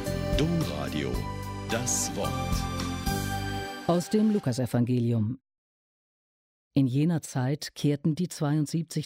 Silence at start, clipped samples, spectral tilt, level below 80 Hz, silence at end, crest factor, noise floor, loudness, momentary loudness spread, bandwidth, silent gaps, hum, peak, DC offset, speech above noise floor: 0 s; under 0.1%; -5.5 dB/octave; -42 dBFS; 0 s; 14 dB; under -90 dBFS; -28 LUFS; 7 LU; 16 kHz; 5.58-6.71 s; none; -14 dBFS; under 0.1%; over 63 dB